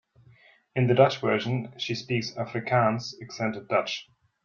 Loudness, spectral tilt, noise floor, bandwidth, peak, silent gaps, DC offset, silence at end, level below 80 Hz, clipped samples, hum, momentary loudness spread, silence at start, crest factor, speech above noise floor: -27 LUFS; -6 dB/octave; -58 dBFS; 7.2 kHz; -6 dBFS; none; under 0.1%; 0.4 s; -66 dBFS; under 0.1%; none; 12 LU; 0.75 s; 22 dB; 32 dB